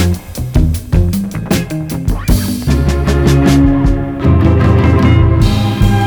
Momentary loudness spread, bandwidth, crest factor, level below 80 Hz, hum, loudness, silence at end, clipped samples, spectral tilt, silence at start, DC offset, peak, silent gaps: 8 LU; over 20 kHz; 10 dB; -16 dBFS; none; -12 LUFS; 0 s; under 0.1%; -7 dB/octave; 0 s; under 0.1%; 0 dBFS; none